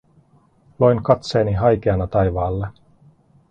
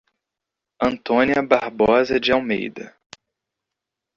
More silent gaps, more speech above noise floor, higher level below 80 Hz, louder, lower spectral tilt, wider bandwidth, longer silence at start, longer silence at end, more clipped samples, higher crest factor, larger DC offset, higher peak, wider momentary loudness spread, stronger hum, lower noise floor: neither; second, 38 dB vs 66 dB; first, -38 dBFS vs -52 dBFS; about the same, -19 LUFS vs -19 LUFS; first, -8 dB/octave vs -5.5 dB/octave; first, 8.8 kHz vs 7.6 kHz; about the same, 0.8 s vs 0.8 s; second, 0.8 s vs 1.25 s; neither; about the same, 20 dB vs 20 dB; neither; about the same, 0 dBFS vs -2 dBFS; second, 7 LU vs 12 LU; neither; second, -55 dBFS vs -85 dBFS